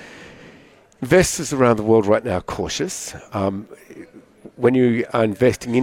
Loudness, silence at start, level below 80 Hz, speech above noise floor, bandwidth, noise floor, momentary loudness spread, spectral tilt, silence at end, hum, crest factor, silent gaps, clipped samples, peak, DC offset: -19 LUFS; 0 s; -46 dBFS; 30 dB; 17 kHz; -49 dBFS; 17 LU; -5 dB/octave; 0 s; none; 18 dB; none; under 0.1%; -2 dBFS; under 0.1%